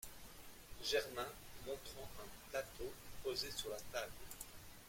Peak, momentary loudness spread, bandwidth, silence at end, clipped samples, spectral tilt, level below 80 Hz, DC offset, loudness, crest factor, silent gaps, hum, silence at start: -26 dBFS; 14 LU; 16.5 kHz; 0 s; under 0.1%; -2 dB/octave; -62 dBFS; under 0.1%; -46 LUFS; 22 dB; none; none; 0 s